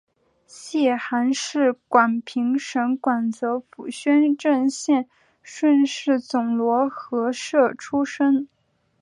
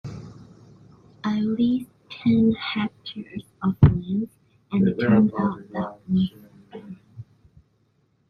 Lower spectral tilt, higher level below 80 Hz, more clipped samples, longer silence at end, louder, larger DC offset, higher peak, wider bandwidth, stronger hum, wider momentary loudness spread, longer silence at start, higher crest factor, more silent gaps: second, -4 dB/octave vs -9 dB/octave; second, -74 dBFS vs -46 dBFS; neither; second, 0.55 s vs 1.1 s; about the same, -22 LUFS vs -23 LUFS; neither; about the same, -4 dBFS vs -2 dBFS; first, 11 kHz vs 6.2 kHz; neither; second, 8 LU vs 22 LU; first, 0.55 s vs 0.05 s; about the same, 18 dB vs 22 dB; neither